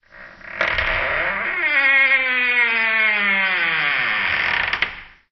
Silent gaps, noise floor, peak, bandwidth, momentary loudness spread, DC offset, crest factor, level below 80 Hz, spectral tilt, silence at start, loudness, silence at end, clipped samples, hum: none; -41 dBFS; -2 dBFS; 6.4 kHz; 7 LU; under 0.1%; 16 dB; -44 dBFS; -4 dB/octave; 0.15 s; -17 LUFS; 0.25 s; under 0.1%; none